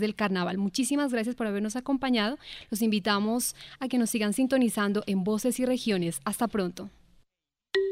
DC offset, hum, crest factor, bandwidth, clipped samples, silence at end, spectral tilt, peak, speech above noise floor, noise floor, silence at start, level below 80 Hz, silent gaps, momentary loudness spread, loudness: under 0.1%; none; 18 dB; 16 kHz; under 0.1%; 0 s; -4.5 dB/octave; -10 dBFS; 55 dB; -83 dBFS; 0 s; -60 dBFS; none; 6 LU; -28 LUFS